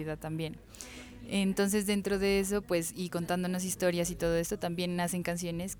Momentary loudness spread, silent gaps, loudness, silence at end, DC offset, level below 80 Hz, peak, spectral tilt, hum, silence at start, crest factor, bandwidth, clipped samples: 11 LU; none; -32 LUFS; 0 s; under 0.1%; -52 dBFS; -16 dBFS; -4.5 dB/octave; none; 0 s; 16 dB; 19.5 kHz; under 0.1%